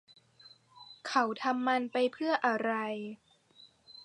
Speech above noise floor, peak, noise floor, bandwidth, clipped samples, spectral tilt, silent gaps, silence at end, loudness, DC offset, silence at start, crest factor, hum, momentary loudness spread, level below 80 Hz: 30 dB; -12 dBFS; -61 dBFS; 10.5 kHz; under 0.1%; -4 dB/octave; none; 0 s; -31 LUFS; under 0.1%; 0.45 s; 22 dB; none; 19 LU; -86 dBFS